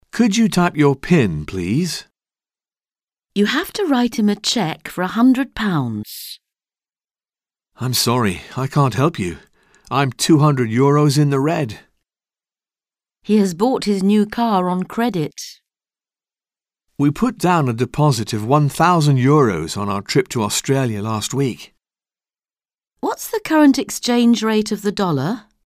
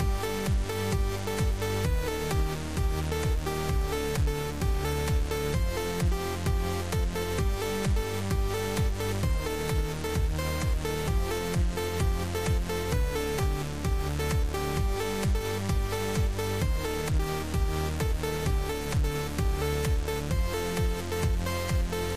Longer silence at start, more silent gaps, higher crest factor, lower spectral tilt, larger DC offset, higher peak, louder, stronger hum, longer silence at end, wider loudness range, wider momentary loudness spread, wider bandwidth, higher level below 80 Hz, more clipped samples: first, 0.15 s vs 0 s; neither; about the same, 16 dB vs 12 dB; about the same, -5.5 dB/octave vs -5.5 dB/octave; second, under 0.1% vs 0.6%; first, -2 dBFS vs -16 dBFS; first, -18 LUFS vs -30 LUFS; neither; first, 0.25 s vs 0 s; first, 5 LU vs 0 LU; first, 11 LU vs 1 LU; about the same, 16 kHz vs 15.5 kHz; second, -50 dBFS vs -32 dBFS; neither